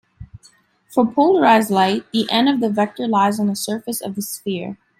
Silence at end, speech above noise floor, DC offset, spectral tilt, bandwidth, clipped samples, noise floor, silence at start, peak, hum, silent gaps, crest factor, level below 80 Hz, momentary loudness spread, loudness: 0.25 s; 36 dB; under 0.1%; -4.5 dB/octave; 16.5 kHz; under 0.1%; -54 dBFS; 0.2 s; -2 dBFS; none; none; 16 dB; -56 dBFS; 12 LU; -18 LUFS